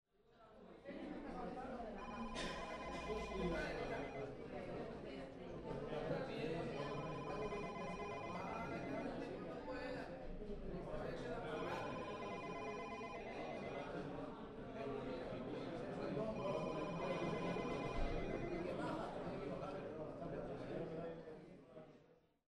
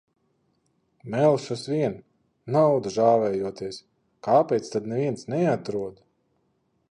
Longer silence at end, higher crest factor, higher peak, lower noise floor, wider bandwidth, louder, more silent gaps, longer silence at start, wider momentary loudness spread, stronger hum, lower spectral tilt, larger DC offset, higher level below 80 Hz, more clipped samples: second, 0.35 s vs 0.95 s; about the same, 16 dB vs 18 dB; second, -30 dBFS vs -6 dBFS; about the same, -71 dBFS vs -71 dBFS; about the same, 11.5 kHz vs 10.5 kHz; second, -47 LUFS vs -24 LUFS; neither; second, 0.3 s vs 1.05 s; second, 8 LU vs 15 LU; neither; about the same, -6.5 dB/octave vs -7 dB/octave; neither; first, -58 dBFS vs -66 dBFS; neither